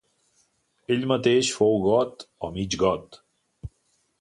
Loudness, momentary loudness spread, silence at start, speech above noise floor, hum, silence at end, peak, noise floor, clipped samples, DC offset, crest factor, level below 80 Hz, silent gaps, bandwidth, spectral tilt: -24 LUFS; 23 LU; 0.9 s; 46 dB; none; 0.5 s; -6 dBFS; -70 dBFS; under 0.1%; under 0.1%; 20 dB; -52 dBFS; none; 11 kHz; -4.5 dB/octave